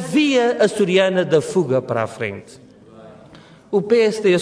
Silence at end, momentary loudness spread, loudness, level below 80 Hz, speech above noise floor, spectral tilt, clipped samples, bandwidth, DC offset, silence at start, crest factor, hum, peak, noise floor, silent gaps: 0 s; 9 LU; -18 LUFS; -62 dBFS; 27 dB; -5.5 dB/octave; under 0.1%; 11 kHz; under 0.1%; 0 s; 14 dB; none; -4 dBFS; -44 dBFS; none